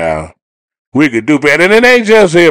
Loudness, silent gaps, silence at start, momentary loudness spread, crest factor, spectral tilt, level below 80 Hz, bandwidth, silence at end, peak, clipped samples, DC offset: -8 LUFS; 0.42-0.68 s, 0.79-0.92 s; 0 s; 11 LU; 8 dB; -5 dB/octave; -40 dBFS; 16.5 kHz; 0 s; 0 dBFS; 2%; under 0.1%